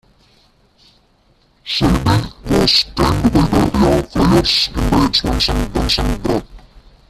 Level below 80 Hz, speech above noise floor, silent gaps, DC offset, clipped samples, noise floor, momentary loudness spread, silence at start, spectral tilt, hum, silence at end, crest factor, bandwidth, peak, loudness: -26 dBFS; 40 dB; none; under 0.1%; under 0.1%; -55 dBFS; 7 LU; 1.65 s; -5.5 dB/octave; none; 0.5 s; 16 dB; 14.5 kHz; 0 dBFS; -15 LUFS